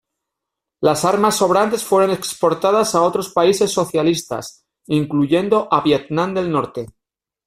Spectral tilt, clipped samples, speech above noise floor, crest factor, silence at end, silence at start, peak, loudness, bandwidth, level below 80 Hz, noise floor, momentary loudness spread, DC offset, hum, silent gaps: -5 dB/octave; under 0.1%; 65 dB; 16 dB; 0.6 s; 0.8 s; -2 dBFS; -17 LUFS; 16 kHz; -56 dBFS; -82 dBFS; 7 LU; under 0.1%; none; none